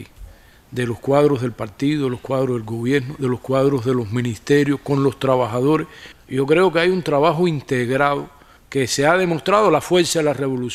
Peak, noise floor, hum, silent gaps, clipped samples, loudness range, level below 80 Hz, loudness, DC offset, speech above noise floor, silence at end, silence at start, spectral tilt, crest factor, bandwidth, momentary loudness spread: -2 dBFS; -42 dBFS; none; none; under 0.1%; 3 LU; -50 dBFS; -19 LUFS; under 0.1%; 23 dB; 0 s; 0 s; -5.5 dB/octave; 16 dB; 15 kHz; 8 LU